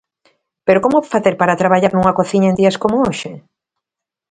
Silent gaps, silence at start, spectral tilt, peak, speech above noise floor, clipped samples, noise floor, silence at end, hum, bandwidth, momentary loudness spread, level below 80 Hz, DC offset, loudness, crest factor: none; 0.65 s; -6.5 dB/octave; 0 dBFS; 70 dB; under 0.1%; -84 dBFS; 0.9 s; none; 9.4 kHz; 7 LU; -50 dBFS; under 0.1%; -14 LUFS; 16 dB